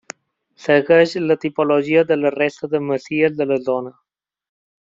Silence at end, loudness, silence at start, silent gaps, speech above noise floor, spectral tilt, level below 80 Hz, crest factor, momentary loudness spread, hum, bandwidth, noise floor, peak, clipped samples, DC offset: 0.9 s; -18 LUFS; 0.6 s; none; 40 dB; -6 dB/octave; -64 dBFS; 16 dB; 12 LU; none; 7.6 kHz; -57 dBFS; -2 dBFS; under 0.1%; under 0.1%